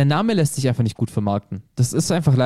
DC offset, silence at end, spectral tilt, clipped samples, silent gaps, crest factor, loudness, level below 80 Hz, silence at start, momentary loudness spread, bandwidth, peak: under 0.1%; 0 s; -6 dB/octave; under 0.1%; none; 12 dB; -20 LUFS; -52 dBFS; 0 s; 6 LU; 14 kHz; -6 dBFS